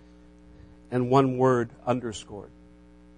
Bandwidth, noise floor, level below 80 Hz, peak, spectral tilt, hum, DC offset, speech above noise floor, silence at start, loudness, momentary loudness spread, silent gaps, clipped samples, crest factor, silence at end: 10 kHz; -53 dBFS; -56 dBFS; -6 dBFS; -7 dB/octave; 60 Hz at -50 dBFS; under 0.1%; 28 dB; 0.9 s; -25 LUFS; 18 LU; none; under 0.1%; 22 dB; 0.7 s